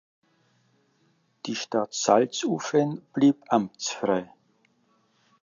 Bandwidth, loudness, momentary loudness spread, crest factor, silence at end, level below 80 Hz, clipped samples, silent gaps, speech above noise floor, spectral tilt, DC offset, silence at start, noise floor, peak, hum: 7.6 kHz; -25 LUFS; 9 LU; 24 dB; 1.2 s; -74 dBFS; under 0.1%; none; 43 dB; -4.5 dB/octave; under 0.1%; 1.45 s; -67 dBFS; -4 dBFS; none